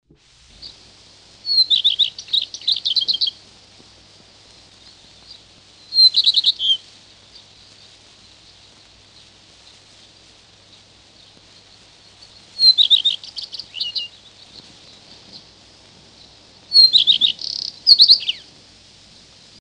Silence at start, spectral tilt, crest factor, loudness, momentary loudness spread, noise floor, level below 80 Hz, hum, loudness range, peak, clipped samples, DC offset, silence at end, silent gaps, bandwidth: 0.6 s; 0.5 dB/octave; 22 dB; -13 LUFS; 20 LU; -51 dBFS; -62 dBFS; none; 11 LU; 0 dBFS; under 0.1%; under 0.1%; 1.2 s; none; 10.5 kHz